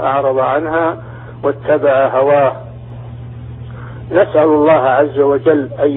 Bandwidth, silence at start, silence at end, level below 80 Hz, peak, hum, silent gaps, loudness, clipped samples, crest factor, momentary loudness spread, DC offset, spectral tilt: 4 kHz; 0 s; 0 s; -44 dBFS; 0 dBFS; none; none; -13 LUFS; under 0.1%; 14 dB; 19 LU; under 0.1%; -11.5 dB/octave